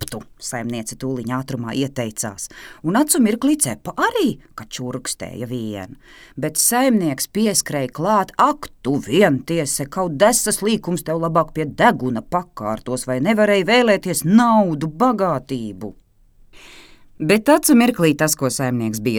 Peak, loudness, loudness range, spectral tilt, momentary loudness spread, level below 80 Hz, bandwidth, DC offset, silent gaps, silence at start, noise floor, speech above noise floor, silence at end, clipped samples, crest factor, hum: 0 dBFS; -18 LUFS; 4 LU; -4 dB/octave; 13 LU; -50 dBFS; 19.5 kHz; under 0.1%; none; 0 s; -51 dBFS; 32 dB; 0 s; under 0.1%; 18 dB; none